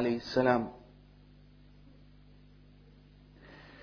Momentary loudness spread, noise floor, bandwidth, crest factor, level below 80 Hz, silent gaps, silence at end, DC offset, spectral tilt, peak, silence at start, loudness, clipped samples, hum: 27 LU; -57 dBFS; 5.4 kHz; 26 dB; -60 dBFS; none; 0 s; under 0.1%; -4.5 dB/octave; -12 dBFS; 0 s; -30 LUFS; under 0.1%; 50 Hz at -60 dBFS